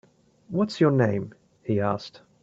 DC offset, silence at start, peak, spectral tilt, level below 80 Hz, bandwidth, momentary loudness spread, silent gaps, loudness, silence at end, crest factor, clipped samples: under 0.1%; 0.5 s; -8 dBFS; -8 dB/octave; -64 dBFS; 8 kHz; 18 LU; none; -25 LUFS; 0.35 s; 18 dB; under 0.1%